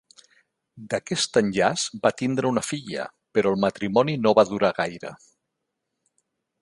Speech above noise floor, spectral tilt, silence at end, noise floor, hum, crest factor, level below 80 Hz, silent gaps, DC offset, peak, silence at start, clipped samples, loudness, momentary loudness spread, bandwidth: 57 dB; -4.5 dB/octave; 1.45 s; -80 dBFS; none; 22 dB; -62 dBFS; none; under 0.1%; -2 dBFS; 0.75 s; under 0.1%; -23 LUFS; 11 LU; 11.5 kHz